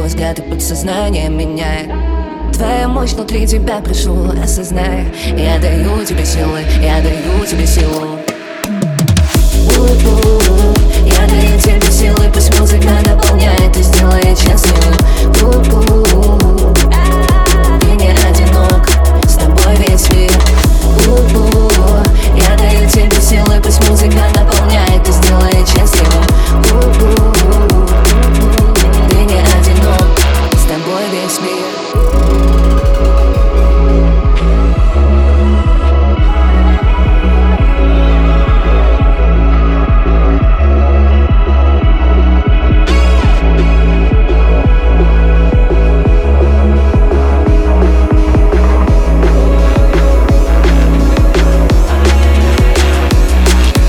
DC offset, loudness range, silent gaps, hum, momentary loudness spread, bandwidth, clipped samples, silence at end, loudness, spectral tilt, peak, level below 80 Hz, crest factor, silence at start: under 0.1%; 4 LU; none; none; 6 LU; 18.5 kHz; under 0.1%; 0 s; -10 LUFS; -5.5 dB/octave; 0 dBFS; -8 dBFS; 8 dB; 0 s